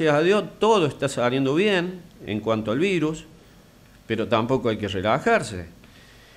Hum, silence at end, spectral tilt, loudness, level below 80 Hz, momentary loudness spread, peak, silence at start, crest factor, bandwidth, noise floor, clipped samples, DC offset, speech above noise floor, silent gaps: none; 0.65 s; -5.5 dB/octave; -23 LUFS; -54 dBFS; 13 LU; -8 dBFS; 0 s; 16 dB; 15 kHz; -51 dBFS; under 0.1%; under 0.1%; 29 dB; none